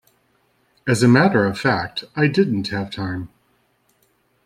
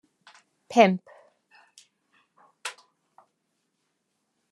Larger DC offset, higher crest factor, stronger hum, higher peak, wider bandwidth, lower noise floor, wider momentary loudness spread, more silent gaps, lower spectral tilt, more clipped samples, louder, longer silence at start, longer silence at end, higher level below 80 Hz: neither; second, 18 dB vs 28 dB; neither; about the same, -2 dBFS vs -2 dBFS; first, 14.5 kHz vs 12.5 kHz; second, -63 dBFS vs -77 dBFS; second, 14 LU vs 19 LU; neither; about the same, -6 dB/octave vs -5.5 dB/octave; neither; first, -19 LUFS vs -24 LUFS; first, 0.85 s vs 0.7 s; second, 1.2 s vs 1.8 s; first, -56 dBFS vs -84 dBFS